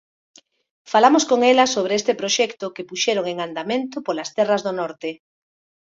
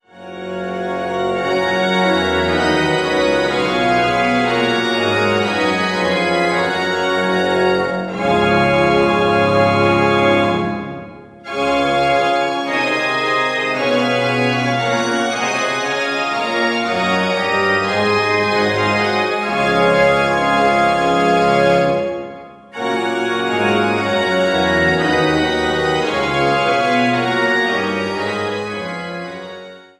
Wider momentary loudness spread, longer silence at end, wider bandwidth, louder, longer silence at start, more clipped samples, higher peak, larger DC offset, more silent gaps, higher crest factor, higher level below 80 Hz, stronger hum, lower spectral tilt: first, 13 LU vs 9 LU; first, 0.7 s vs 0.2 s; second, 8 kHz vs 13 kHz; second, -20 LUFS vs -16 LUFS; first, 0.9 s vs 0.15 s; neither; about the same, 0 dBFS vs -2 dBFS; neither; neither; first, 20 dB vs 14 dB; second, -68 dBFS vs -46 dBFS; neither; second, -2.5 dB/octave vs -5 dB/octave